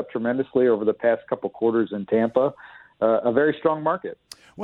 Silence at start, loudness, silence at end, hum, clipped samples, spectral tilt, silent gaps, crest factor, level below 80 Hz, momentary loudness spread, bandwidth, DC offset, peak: 0 s; -23 LUFS; 0 s; none; under 0.1%; -7.5 dB/octave; none; 18 dB; -66 dBFS; 7 LU; 12 kHz; under 0.1%; -6 dBFS